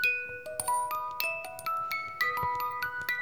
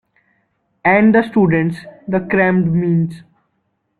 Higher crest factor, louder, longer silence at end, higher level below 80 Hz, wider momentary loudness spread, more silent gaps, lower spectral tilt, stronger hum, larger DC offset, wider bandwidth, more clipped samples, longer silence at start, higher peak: first, 22 dB vs 14 dB; second, -32 LUFS vs -15 LUFS; second, 0 s vs 0.8 s; second, -66 dBFS vs -52 dBFS; second, 5 LU vs 10 LU; neither; second, -1 dB/octave vs -9.5 dB/octave; neither; first, 0.2% vs under 0.1%; first, over 20 kHz vs 9.8 kHz; neither; second, 0 s vs 0.85 s; second, -10 dBFS vs -2 dBFS